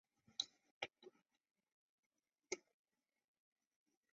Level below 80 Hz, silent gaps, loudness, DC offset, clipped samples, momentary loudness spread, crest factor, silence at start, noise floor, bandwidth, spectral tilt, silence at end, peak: under -90 dBFS; 0.71-0.81 s, 1.72-2.10 s; -50 LUFS; under 0.1%; under 0.1%; 14 LU; 32 dB; 0.4 s; -68 dBFS; 7.4 kHz; 1 dB/octave; 1.55 s; -24 dBFS